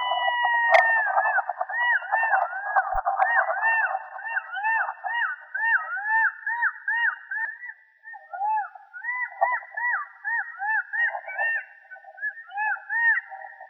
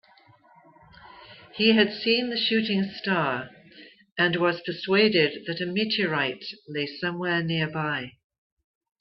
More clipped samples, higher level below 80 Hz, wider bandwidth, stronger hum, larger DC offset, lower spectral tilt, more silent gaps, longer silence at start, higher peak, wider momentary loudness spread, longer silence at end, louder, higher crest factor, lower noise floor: neither; first, -56 dBFS vs -68 dBFS; about the same, 6.4 kHz vs 6 kHz; neither; neither; second, 5.5 dB/octave vs -8 dB/octave; second, none vs 4.12-4.16 s; second, 0 s vs 1 s; about the same, -4 dBFS vs -6 dBFS; about the same, 11 LU vs 12 LU; second, 0.05 s vs 0.9 s; about the same, -24 LUFS vs -25 LUFS; about the same, 22 dB vs 20 dB; second, -46 dBFS vs -57 dBFS